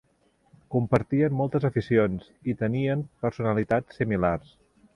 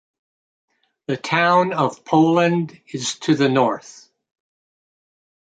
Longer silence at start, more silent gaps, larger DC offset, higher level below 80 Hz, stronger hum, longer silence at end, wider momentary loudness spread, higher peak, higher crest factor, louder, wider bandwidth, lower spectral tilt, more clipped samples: second, 0.7 s vs 1.1 s; neither; neither; first, -50 dBFS vs -68 dBFS; neither; second, 0.55 s vs 1.6 s; second, 7 LU vs 12 LU; about the same, -6 dBFS vs -4 dBFS; about the same, 20 dB vs 18 dB; second, -26 LUFS vs -19 LUFS; first, 10.5 kHz vs 9.4 kHz; first, -9.5 dB/octave vs -5.5 dB/octave; neither